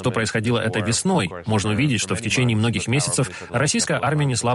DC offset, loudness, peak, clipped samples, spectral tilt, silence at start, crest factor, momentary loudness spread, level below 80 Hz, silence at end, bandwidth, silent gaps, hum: under 0.1%; -21 LUFS; -8 dBFS; under 0.1%; -4.5 dB/octave; 0 s; 14 dB; 3 LU; -50 dBFS; 0 s; 11.5 kHz; none; none